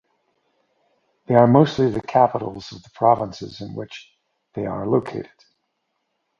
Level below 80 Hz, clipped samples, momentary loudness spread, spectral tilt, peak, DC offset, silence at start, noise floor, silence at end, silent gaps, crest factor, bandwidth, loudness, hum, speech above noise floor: -56 dBFS; under 0.1%; 21 LU; -8 dB/octave; 0 dBFS; under 0.1%; 1.3 s; -74 dBFS; 1.15 s; none; 22 dB; 7.4 kHz; -19 LUFS; none; 54 dB